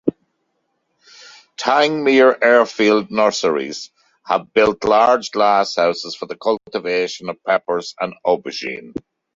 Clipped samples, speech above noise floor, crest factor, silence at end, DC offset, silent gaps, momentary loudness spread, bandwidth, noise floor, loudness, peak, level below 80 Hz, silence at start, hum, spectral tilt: under 0.1%; 53 dB; 16 dB; 0.35 s; under 0.1%; none; 14 LU; 7.8 kHz; -70 dBFS; -17 LUFS; -2 dBFS; -58 dBFS; 0.05 s; none; -4 dB/octave